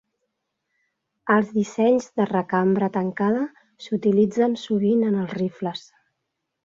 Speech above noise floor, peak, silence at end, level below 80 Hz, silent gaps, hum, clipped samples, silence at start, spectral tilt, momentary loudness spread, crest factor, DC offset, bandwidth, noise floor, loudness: 58 dB; -4 dBFS; 0.85 s; -66 dBFS; none; none; under 0.1%; 1.25 s; -7 dB/octave; 11 LU; 18 dB; under 0.1%; 7.6 kHz; -79 dBFS; -22 LUFS